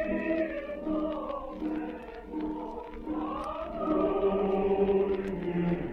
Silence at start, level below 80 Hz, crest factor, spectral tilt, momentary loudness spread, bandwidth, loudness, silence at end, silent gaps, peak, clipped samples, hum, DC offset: 0 s; -48 dBFS; 16 dB; -9 dB/octave; 11 LU; 6 kHz; -31 LUFS; 0 s; none; -14 dBFS; under 0.1%; none; under 0.1%